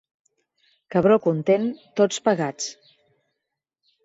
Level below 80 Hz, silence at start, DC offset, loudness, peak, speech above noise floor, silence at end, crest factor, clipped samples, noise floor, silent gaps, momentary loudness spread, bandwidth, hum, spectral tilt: -64 dBFS; 0.9 s; under 0.1%; -22 LUFS; -6 dBFS; 62 dB; 1.35 s; 18 dB; under 0.1%; -83 dBFS; none; 9 LU; 8 kHz; none; -5.5 dB/octave